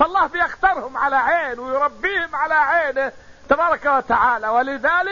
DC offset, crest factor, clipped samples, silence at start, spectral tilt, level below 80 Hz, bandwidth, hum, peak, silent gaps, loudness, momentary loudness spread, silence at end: 0.3%; 14 dB; under 0.1%; 0 s; -4.5 dB/octave; -48 dBFS; 7.4 kHz; none; -4 dBFS; none; -19 LUFS; 5 LU; 0 s